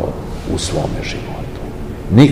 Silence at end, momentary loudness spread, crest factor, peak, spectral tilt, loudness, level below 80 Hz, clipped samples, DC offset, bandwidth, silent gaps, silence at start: 0 s; 13 LU; 16 dB; 0 dBFS; -6.5 dB/octave; -20 LUFS; -30 dBFS; 0.7%; 0.5%; 15.5 kHz; none; 0 s